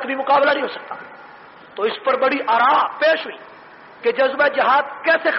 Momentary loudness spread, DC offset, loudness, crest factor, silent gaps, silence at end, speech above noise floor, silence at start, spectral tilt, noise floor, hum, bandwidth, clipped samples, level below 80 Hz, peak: 18 LU; under 0.1%; -18 LUFS; 12 dB; none; 0 s; 24 dB; 0 s; 0.5 dB/octave; -42 dBFS; none; 5.8 kHz; under 0.1%; -72 dBFS; -6 dBFS